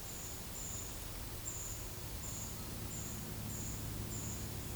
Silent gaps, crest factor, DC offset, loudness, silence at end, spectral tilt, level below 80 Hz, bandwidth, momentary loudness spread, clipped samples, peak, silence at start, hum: none; 14 dB; under 0.1%; -42 LUFS; 0 s; -3.5 dB/octave; -52 dBFS; over 20 kHz; 2 LU; under 0.1%; -30 dBFS; 0 s; none